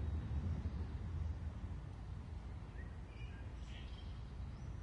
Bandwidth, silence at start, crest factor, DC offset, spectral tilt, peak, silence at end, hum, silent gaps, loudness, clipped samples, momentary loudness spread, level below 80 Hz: 8.4 kHz; 0 s; 14 dB; under 0.1%; -7.5 dB/octave; -32 dBFS; 0 s; none; none; -47 LUFS; under 0.1%; 8 LU; -48 dBFS